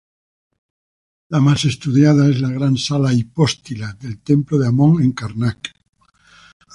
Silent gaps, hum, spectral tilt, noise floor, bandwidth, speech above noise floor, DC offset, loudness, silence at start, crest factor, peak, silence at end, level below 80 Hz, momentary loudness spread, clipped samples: none; none; -6.5 dB/octave; under -90 dBFS; 11 kHz; over 74 dB; under 0.1%; -16 LUFS; 1.3 s; 16 dB; -2 dBFS; 1.05 s; -48 dBFS; 15 LU; under 0.1%